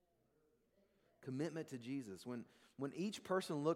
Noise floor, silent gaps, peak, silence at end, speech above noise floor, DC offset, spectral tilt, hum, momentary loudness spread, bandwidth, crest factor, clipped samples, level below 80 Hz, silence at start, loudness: -79 dBFS; none; -24 dBFS; 0 s; 35 dB; under 0.1%; -6 dB/octave; none; 10 LU; 16 kHz; 20 dB; under 0.1%; -88 dBFS; 1.2 s; -45 LUFS